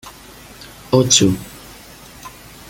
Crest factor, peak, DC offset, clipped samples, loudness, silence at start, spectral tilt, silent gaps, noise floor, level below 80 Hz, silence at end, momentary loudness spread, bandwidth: 20 dB; 0 dBFS; under 0.1%; under 0.1%; -14 LUFS; 0.05 s; -3.5 dB/octave; none; -40 dBFS; -46 dBFS; 0.4 s; 26 LU; 17 kHz